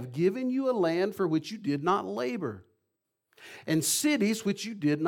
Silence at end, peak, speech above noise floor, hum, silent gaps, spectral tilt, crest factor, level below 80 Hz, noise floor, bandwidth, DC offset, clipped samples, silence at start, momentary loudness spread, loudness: 0 s; -14 dBFS; 54 dB; none; none; -4.5 dB/octave; 16 dB; -76 dBFS; -82 dBFS; 17.5 kHz; under 0.1%; under 0.1%; 0 s; 10 LU; -29 LUFS